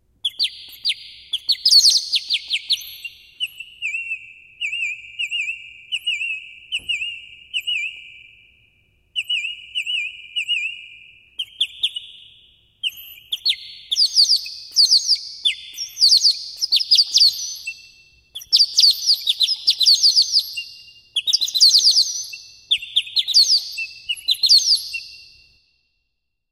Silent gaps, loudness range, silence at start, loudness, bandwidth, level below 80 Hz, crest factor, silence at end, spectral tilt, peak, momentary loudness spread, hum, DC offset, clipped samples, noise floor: none; 11 LU; 0.25 s; -16 LUFS; 16 kHz; -66 dBFS; 20 dB; 1.3 s; 5.5 dB/octave; -2 dBFS; 18 LU; none; under 0.1%; under 0.1%; -76 dBFS